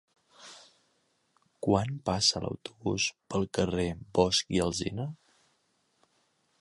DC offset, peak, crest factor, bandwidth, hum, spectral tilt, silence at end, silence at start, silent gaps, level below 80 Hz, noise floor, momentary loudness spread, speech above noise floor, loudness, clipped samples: under 0.1%; -8 dBFS; 24 dB; 11.5 kHz; none; -4 dB/octave; 1.45 s; 0.4 s; none; -52 dBFS; -73 dBFS; 12 LU; 43 dB; -30 LUFS; under 0.1%